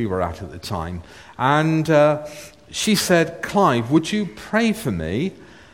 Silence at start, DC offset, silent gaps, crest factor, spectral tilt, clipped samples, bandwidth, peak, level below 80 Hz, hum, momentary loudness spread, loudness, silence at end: 0 s; 0.1%; none; 18 dB; -5 dB/octave; under 0.1%; 17 kHz; -2 dBFS; -46 dBFS; none; 15 LU; -20 LUFS; 0.3 s